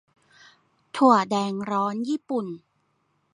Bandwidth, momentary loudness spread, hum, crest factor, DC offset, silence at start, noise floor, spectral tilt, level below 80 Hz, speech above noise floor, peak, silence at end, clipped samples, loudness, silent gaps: 11 kHz; 18 LU; none; 22 dB; under 0.1%; 0.95 s; -70 dBFS; -6 dB/octave; -76 dBFS; 47 dB; -4 dBFS; 0.75 s; under 0.1%; -23 LUFS; none